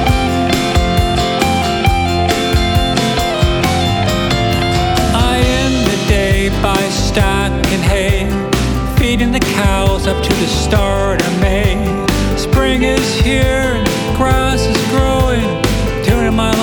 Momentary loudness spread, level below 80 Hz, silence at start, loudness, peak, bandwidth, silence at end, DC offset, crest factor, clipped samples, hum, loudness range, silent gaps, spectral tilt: 2 LU; -20 dBFS; 0 s; -14 LUFS; 0 dBFS; over 20 kHz; 0 s; under 0.1%; 12 dB; under 0.1%; none; 1 LU; none; -5 dB/octave